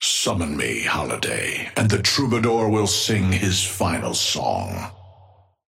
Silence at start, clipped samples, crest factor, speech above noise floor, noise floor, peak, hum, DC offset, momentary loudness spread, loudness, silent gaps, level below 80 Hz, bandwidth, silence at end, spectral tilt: 0 s; under 0.1%; 18 dB; 31 dB; -53 dBFS; -4 dBFS; none; under 0.1%; 5 LU; -21 LUFS; none; -48 dBFS; 16.5 kHz; 0.55 s; -3.5 dB/octave